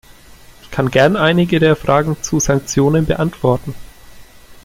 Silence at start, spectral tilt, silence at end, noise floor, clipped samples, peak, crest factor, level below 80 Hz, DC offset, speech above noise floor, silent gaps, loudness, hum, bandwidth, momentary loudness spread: 0.65 s; -5.5 dB/octave; 0.1 s; -41 dBFS; under 0.1%; 0 dBFS; 16 dB; -36 dBFS; under 0.1%; 27 dB; none; -15 LUFS; none; 16 kHz; 9 LU